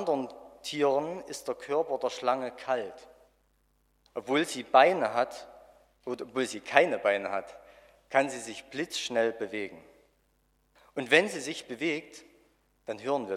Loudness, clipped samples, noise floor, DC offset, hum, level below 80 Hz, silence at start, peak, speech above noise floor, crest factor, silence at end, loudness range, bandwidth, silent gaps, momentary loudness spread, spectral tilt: -29 LUFS; under 0.1%; -70 dBFS; under 0.1%; 60 Hz at -75 dBFS; -72 dBFS; 0 s; -2 dBFS; 41 dB; 28 dB; 0 s; 6 LU; 15 kHz; none; 17 LU; -3.5 dB/octave